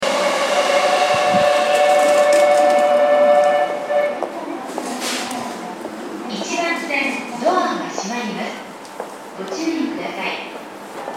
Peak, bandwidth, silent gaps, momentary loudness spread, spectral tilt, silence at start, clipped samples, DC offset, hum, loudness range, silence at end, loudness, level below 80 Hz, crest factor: -2 dBFS; 15.5 kHz; none; 17 LU; -3 dB/octave; 0 s; under 0.1%; under 0.1%; none; 9 LU; 0 s; -18 LUFS; -66 dBFS; 16 dB